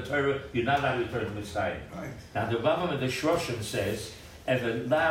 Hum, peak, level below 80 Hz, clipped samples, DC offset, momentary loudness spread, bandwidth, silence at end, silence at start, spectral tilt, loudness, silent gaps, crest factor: none; -12 dBFS; -54 dBFS; under 0.1%; under 0.1%; 11 LU; 16 kHz; 0 s; 0 s; -5.5 dB/octave; -29 LUFS; none; 16 dB